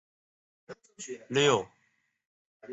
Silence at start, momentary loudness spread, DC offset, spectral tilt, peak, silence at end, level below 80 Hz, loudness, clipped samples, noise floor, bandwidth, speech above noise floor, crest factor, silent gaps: 0.7 s; 26 LU; under 0.1%; -3.5 dB/octave; -12 dBFS; 0 s; -72 dBFS; -27 LUFS; under 0.1%; -74 dBFS; 8.2 kHz; 44 dB; 22 dB; 2.27-2.60 s